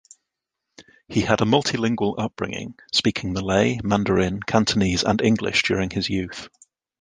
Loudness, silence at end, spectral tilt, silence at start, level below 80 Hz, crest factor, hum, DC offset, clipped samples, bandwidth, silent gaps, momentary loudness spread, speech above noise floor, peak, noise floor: -22 LUFS; 0.55 s; -5 dB/octave; 0.8 s; -44 dBFS; 20 dB; none; under 0.1%; under 0.1%; 9.8 kHz; none; 8 LU; 61 dB; -2 dBFS; -82 dBFS